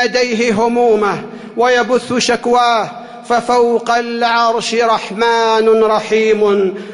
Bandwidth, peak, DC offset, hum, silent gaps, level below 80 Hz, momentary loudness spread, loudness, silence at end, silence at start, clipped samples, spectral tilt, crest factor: 11 kHz; -2 dBFS; under 0.1%; none; none; -54 dBFS; 5 LU; -13 LUFS; 0 s; 0 s; under 0.1%; -3.5 dB/octave; 10 dB